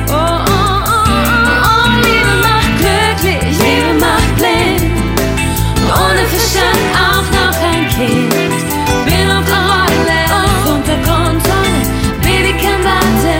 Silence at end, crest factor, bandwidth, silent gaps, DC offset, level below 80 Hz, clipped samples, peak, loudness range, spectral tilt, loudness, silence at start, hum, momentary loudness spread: 0 s; 10 dB; 16.5 kHz; none; under 0.1%; -20 dBFS; under 0.1%; 0 dBFS; 2 LU; -4.5 dB/octave; -11 LUFS; 0 s; none; 4 LU